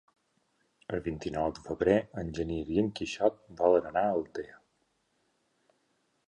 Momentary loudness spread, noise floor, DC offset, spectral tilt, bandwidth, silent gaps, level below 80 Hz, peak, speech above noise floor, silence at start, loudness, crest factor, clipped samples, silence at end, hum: 12 LU; -75 dBFS; under 0.1%; -6.5 dB/octave; 10 kHz; none; -54 dBFS; -10 dBFS; 45 dB; 0.9 s; -31 LUFS; 22 dB; under 0.1%; 1.75 s; none